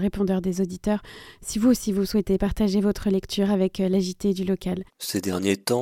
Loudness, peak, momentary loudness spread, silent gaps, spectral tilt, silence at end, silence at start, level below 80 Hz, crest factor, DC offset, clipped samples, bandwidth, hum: -24 LUFS; -8 dBFS; 7 LU; none; -6 dB/octave; 0 s; 0 s; -42 dBFS; 16 dB; under 0.1%; under 0.1%; 16.5 kHz; none